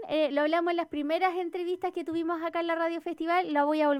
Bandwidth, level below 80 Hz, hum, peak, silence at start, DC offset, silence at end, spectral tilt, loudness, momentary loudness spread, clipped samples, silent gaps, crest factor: 14 kHz; -72 dBFS; none; -14 dBFS; 0 s; under 0.1%; 0 s; -5 dB/octave; -29 LUFS; 6 LU; under 0.1%; none; 14 dB